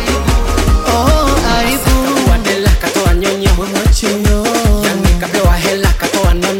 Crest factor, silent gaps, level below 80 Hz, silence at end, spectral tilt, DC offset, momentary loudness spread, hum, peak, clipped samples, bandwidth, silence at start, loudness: 10 dB; none; -14 dBFS; 0 s; -4.5 dB/octave; 0.2%; 2 LU; none; 0 dBFS; under 0.1%; 17 kHz; 0 s; -12 LUFS